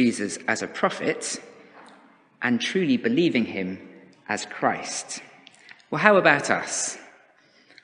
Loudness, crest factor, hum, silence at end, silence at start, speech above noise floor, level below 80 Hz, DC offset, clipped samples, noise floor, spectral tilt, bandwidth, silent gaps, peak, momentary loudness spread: -24 LUFS; 24 dB; none; 0.75 s; 0 s; 34 dB; -72 dBFS; under 0.1%; under 0.1%; -58 dBFS; -3.5 dB/octave; 10 kHz; none; 0 dBFS; 15 LU